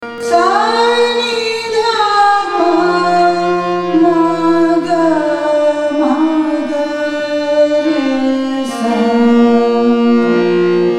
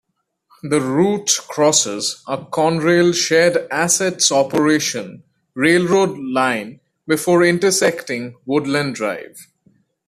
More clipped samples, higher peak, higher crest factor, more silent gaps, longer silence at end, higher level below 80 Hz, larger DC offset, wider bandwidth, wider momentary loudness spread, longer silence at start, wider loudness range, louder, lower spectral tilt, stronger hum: neither; about the same, 0 dBFS vs -2 dBFS; about the same, 12 dB vs 16 dB; neither; second, 0 s vs 0.65 s; first, -54 dBFS vs -60 dBFS; neither; second, 11.5 kHz vs 15 kHz; second, 5 LU vs 12 LU; second, 0 s vs 0.65 s; about the same, 2 LU vs 2 LU; first, -12 LUFS vs -17 LUFS; first, -5 dB/octave vs -3.5 dB/octave; neither